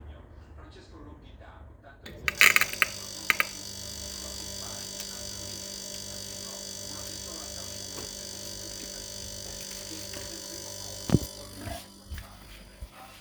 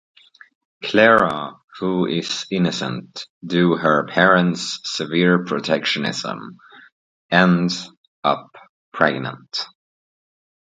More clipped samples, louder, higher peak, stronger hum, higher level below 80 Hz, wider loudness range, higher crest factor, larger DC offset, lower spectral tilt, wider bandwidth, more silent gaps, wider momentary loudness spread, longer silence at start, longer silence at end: neither; second, -30 LUFS vs -19 LUFS; about the same, 0 dBFS vs 0 dBFS; neither; first, -50 dBFS vs -60 dBFS; first, 10 LU vs 3 LU; first, 34 dB vs 20 dB; neither; second, -2 dB/octave vs -5 dB/octave; first, over 20 kHz vs 9.2 kHz; second, none vs 1.64-1.68 s, 3.30-3.41 s, 6.92-7.29 s, 7.97-8.23 s, 8.69-8.92 s; first, 22 LU vs 16 LU; second, 0 s vs 0.8 s; second, 0 s vs 1.05 s